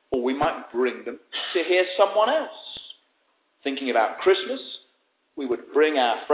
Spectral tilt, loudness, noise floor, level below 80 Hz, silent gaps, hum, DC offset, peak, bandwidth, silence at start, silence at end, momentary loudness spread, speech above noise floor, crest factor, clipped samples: -7.5 dB/octave; -24 LUFS; -69 dBFS; -64 dBFS; none; none; under 0.1%; -6 dBFS; 4 kHz; 0.1 s; 0 s; 17 LU; 45 dB; 20 dB; under 0.1%